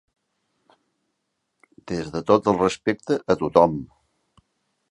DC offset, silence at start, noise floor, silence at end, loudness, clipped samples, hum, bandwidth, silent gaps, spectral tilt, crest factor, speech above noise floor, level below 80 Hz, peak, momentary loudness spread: under 0.1%; 1.85 s; -77 dBFS; 1.05 s; -21 LUFS; under 0.1%; none; 11 kHz; none; -6 dB/octave; 24 dB; 56 dB; -54 dBFS; -2 dBFS; 12 LU